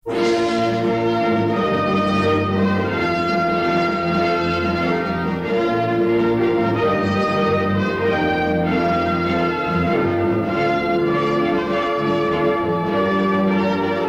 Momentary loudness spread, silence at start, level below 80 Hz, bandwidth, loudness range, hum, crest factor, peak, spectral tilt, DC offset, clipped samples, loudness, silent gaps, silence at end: 2 LU; 0.05 s; -46 dBFS; 9.2 kHz; 1 LU; none; 12 dB; -8 dBFS; -7 dB/octave; under 0.1%; under 0.1%; -19 LUFS; none; 0 s